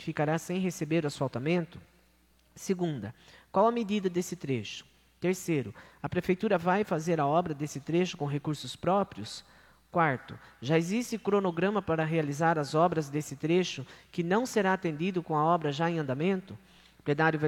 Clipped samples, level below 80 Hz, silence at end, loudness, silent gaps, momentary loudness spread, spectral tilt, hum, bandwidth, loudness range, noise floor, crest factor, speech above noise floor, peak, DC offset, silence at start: under 0.1%; -64 dBFS; 0 s; -30 LUFS; none; 13 LU; -6 dB/octave; none; 16 kHz; 3 LU; -65 dBFS; 18 dB; 35 dB; -12 dBFS; under 0.1%; 0 s